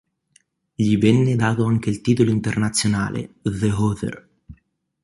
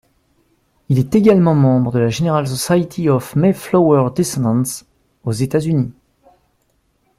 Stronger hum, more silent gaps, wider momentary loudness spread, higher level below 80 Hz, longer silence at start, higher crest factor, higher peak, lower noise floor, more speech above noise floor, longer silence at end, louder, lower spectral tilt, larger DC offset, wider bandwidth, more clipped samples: neither; neither; about the same, 11 LU vs 9 LU; about the same, -46 dBFS vs -50 dBFS; about the same, 0.8 s vs 0.9 s; about the same, 18 dB vs 16 dB; about the same, -4 dBFS vs -2 dBFS; about the same, -61 dBFS vs -63 dBFS; second, 42 dB vs 48 dB; second, 0.5 s vs 1.3 s; second, -20 LUFS vs -16 LUFS; about the same, -6 dB/octave vs -7 dB/octave; neither; second, 11.5 kHz vs 15.5 kHz; neither